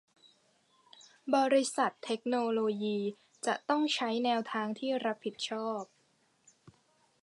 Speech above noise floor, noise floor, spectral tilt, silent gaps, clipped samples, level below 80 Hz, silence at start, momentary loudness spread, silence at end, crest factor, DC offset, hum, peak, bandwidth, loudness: 40 dB; -71 dBFS; -3.5 dB/octave; none; under 0.1%; -86 dBFS; 1.25 s; 10 LU; 0.55 s; 20 dB; under 0.1%; none; -14 dBFS; 11 kHz; -32 LUFS